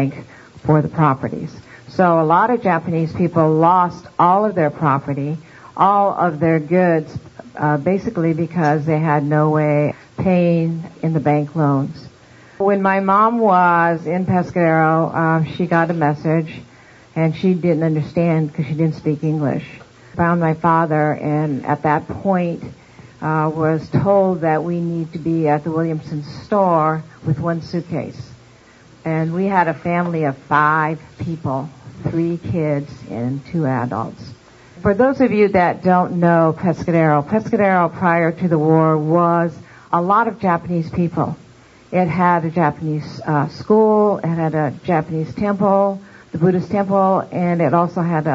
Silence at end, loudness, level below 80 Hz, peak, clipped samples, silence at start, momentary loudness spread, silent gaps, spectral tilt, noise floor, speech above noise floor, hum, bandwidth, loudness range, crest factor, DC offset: 0 s; -17 LUFS; -52 dBFS; 0 dBFS; under 0.1%; 0 s; 10 LU; none; -9 dB/octave; -46 dBFS; 29 dB; none; 7.4 kHz; 4 LU; 16 dB; under 0.1%